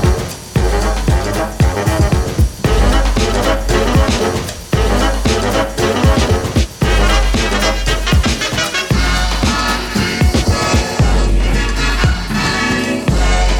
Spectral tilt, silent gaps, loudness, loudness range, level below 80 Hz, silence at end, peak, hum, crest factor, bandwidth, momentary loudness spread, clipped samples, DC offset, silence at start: -4.5 dB/octave; none; -15 LUFS; 1 LU; -16 dBFS; 0 s; 0 dBFS; none; 14 dB; 17.5 kHz; 3 LU; under 0.1%; under 0.1%; 0 s